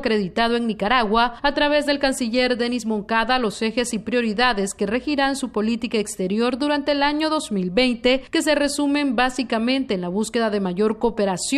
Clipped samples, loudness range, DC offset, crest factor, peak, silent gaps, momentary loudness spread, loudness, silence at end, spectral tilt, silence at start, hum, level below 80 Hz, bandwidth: under 0.1%; 2 LU; under 0.1%; 18 dB; -4 dBFS; none; 5 LU; -21 LUFS; 0 s; -4 dB/octave; 0 s; none; -44 dBFS; 13.5 kHz